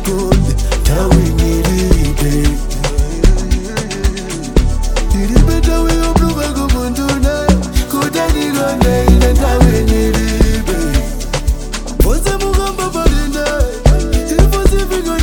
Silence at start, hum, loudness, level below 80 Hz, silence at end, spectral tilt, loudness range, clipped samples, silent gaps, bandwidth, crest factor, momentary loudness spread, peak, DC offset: 0 s; none; -14 LUFS; -14 dBFS; 0 s; -5.5 dB/octave; 3 LU; under 0.1%; none; 19 kHz; 12 dB; 7 LU; 0 dBFS; under 0.1%